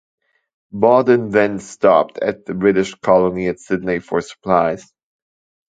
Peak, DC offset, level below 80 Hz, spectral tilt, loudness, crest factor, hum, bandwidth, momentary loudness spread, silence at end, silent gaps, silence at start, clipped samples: 0 dBFS; under 0.1%; -52 dBFS; -6.5 dB/octave; -17 LUFS; 18 dB; none; 9.2 kHz; 9 LU; 0.95 s; none; 0.75 s; under 0.1%